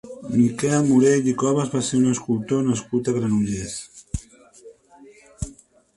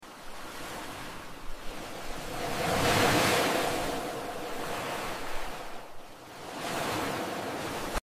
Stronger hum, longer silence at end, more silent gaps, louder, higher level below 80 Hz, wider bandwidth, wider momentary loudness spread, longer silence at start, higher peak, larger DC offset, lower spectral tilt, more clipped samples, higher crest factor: neither; first, 0.45 s vs 0 s; neither; first, -21 LUFS vs -31 LUFS; about the same, -44 dBFS vs -46 dBFS; second, 11.5 kHz vs 16 kHz; about the same, 17 LU vs 19 LU; about the same, 0.05 s vs 0 s; first, -6 dBFS vs -12 dBFS; neither; first, -6 dB/octave vs -3.5 dB/octave; neither; about the same, 16 dB vs 20 dB